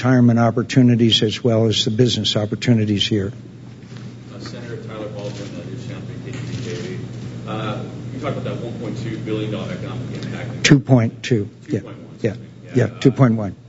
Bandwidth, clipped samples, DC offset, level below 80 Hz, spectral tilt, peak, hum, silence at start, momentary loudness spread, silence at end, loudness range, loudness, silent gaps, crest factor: 8 kHz; under 0.1%; under 0.1%; -52 dBFS; -6 dB/octave; 0 dBFS; none; 0 s; 17 LU; 0 s; 13 LU; -19 LUFS; none; 20 dB